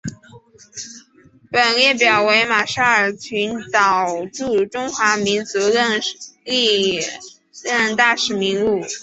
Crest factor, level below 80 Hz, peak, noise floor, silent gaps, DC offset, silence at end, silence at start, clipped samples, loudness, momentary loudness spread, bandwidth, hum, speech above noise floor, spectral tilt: 18 dB; -58 dBFS; -2 dBFS; -51 dBFS; none; under 0.1%; 0 s; 0.05 s; under 0.1%; -17 LUFS; 17 LU; 8.2 kHz; none; 33 dB; -2.5 dB/octave